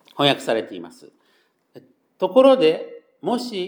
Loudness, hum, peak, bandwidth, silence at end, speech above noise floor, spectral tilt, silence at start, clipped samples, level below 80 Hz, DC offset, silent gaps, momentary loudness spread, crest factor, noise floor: -19 LUFS; none; -2 dBFS; 19.5 kHz; 0 s; 45 dB; -5 dB/octave; 0.15 s; under 0.1%; -80 dBFS; under 0.1%; none; 20 LU; 20 dB; -63 dBFS